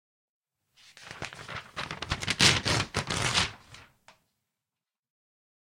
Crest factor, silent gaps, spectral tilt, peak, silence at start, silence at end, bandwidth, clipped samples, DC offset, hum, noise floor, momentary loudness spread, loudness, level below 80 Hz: 30 dB; none; -2 dB/octave; -2 dBFS; 0.95 s; 1.85 s; 16.5 kHz; under 0.1%; under 0.1%; none; under -90 dBFS; 19 LU; -27 LUFS; -52 dBFS